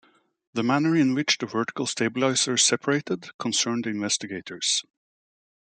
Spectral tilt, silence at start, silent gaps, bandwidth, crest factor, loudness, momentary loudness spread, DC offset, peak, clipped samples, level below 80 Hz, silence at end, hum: -3 dB/octave; 0.55 s; 3.34-3.39 s; 9.6 kHz; 20 dB; -24 LUFS; 8 LU; under 0.1%; -6 dBFS; under 0.1%; -72 dBFS; 0.85 s; none